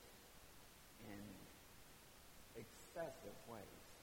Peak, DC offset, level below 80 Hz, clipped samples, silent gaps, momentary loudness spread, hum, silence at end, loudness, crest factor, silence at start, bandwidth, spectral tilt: -36 dBFS; under 0.1%; -72 dBFS; under 0.1%; none; 11 LU; none; 0 s; -58 LUFS; 22 dB; 0 s; 18 kHz; -4 dB/octave